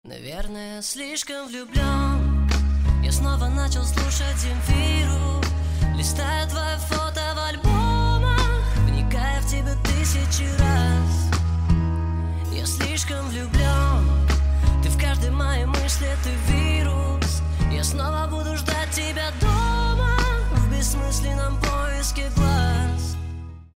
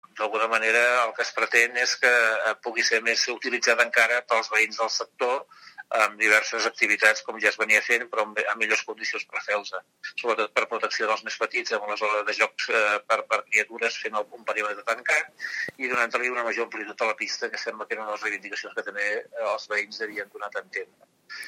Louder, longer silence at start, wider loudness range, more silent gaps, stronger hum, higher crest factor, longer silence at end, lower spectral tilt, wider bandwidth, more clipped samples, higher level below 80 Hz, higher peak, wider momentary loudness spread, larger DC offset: about the same, -23 LUFS vs -24 LUFS; about the same, 0.05 s vs 0.15 s; second, 2 LU vs 7 LU; neither; neither; second, 16 dB vs 24 dB; about the same, 0.1 s vs 0 s; first, -5 dB/octave vs 0 dB/octave; about the same, 16 kHz vs 16 kHz; neither; first, -24 dBFS vs -82 dBFS; about the same, -4 dBFS vs -2 dBFS; second, 6 LU vs 12 LU; neither